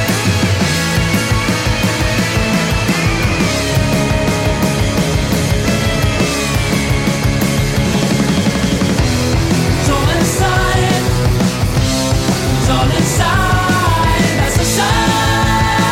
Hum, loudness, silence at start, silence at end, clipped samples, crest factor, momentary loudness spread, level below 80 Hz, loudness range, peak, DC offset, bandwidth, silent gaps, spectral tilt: none; -14 LUFS; 0 s; 0 s; under 0.1%; 10 dB; 2 LU; -24 dBFS; 1 LU; -4 dBFS; under 0.1%; 17 kHz; none; -4.5 dB/octave